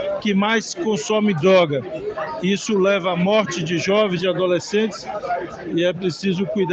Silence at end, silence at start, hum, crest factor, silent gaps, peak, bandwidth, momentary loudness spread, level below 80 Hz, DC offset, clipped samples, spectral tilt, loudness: 0 s; 0 s; none; 14 dB; none; -4 dBFS; 8.4 kHz; 9 LU; -58 dBFS; under 0.1%; under 0.1%; -5 dB/octave; -20 LUFS